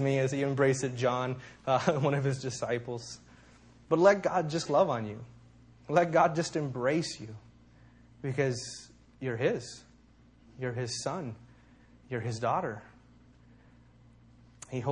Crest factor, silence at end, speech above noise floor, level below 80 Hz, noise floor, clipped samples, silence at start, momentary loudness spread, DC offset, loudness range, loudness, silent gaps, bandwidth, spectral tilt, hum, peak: 22 dB; 0 s; 30 dB; -64 dBFS; -60 dBFS; under 0.1%; 0 s; 19 LU; under 0.1%; 9 LU; -30 LUFS; none; 10.5 kHz; -5.5 dB/octave; none; -10 dBFS